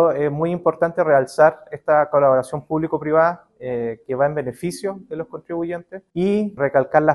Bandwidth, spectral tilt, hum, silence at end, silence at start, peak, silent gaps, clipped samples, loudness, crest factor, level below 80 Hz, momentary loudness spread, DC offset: 12.5 kHz; -7 dB/octave; none; 0 s; 0 s; -2 dBFS; none; under 0.1%; -20 LUFS; 18 dB; -58 dBFS; 13 LU; under 0.1%